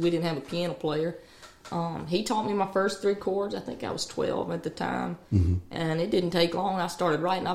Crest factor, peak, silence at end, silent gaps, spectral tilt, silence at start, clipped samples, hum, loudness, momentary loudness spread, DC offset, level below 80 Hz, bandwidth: 18 dB; -10 dBFS; 0 s; none; -6 dB/octave; 0 s; under 0.1%; none; -29 LUFS; 7 LU; 0.2%; -48 dBFS; 15 kHz